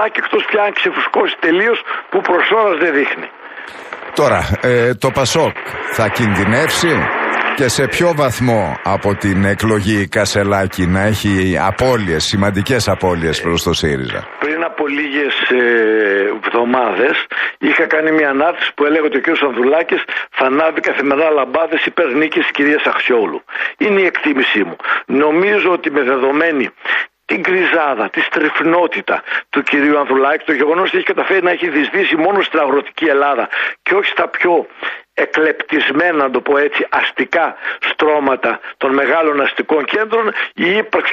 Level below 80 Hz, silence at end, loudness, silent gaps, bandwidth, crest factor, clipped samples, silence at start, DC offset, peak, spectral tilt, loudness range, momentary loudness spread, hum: -44 dBFS; 0 s; -14 LUFS; none; 15 kHz; 14 dB; under 0.1%; 0 s; under 0.1%; -2 dBFS; -5 dB/octave; 1 LU; 5 LU; none